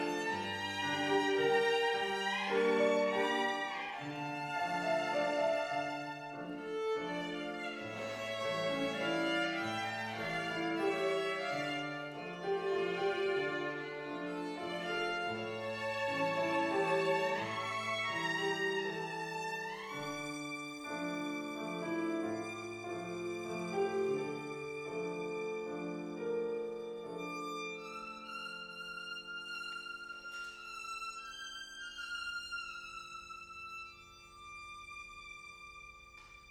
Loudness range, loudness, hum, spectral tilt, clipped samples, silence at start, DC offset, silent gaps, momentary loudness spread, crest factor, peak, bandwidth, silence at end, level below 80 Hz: 10 LU; -37 LUFS; none; -4 dB/octave; under 0.1%; 0 s; under 0.1%; none; 13 LU; 18 dB; -20 dBFS; 16 kHz; 0 s; -72 dBFS